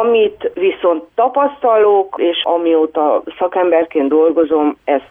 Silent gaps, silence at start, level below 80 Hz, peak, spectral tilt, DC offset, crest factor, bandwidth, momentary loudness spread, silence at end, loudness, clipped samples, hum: none; 0 s; -58 dBFS; -2 dBFS; -7.5 dB/octave; under 0.1%; 12 dB; 3.8 kHz; 5 LU; 0.1 s; -14 LUFS; under 0.1%; none